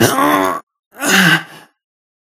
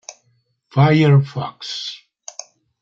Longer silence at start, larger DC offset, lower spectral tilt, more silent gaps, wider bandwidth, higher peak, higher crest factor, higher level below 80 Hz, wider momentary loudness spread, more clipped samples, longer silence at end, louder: about the same, 0 s vs 0.1 s; neither; second, -3.5 dB/octave vs -6.5 dB/octave; first, 0.63-0.67 s, 0.79-0.91 s vs none; first, 17 kHz vs 7.4 kHz; about the same, 0 dBFS vs -2 dBFS; about the same, 16 dB vs 18 dB; about the same, -56 dBFS vs -58 dBFS; second, 11 LU vs 22 LU; neither; second, 0.7 s vs 0.85 s; first, -13 LUFS vs -17 LUFS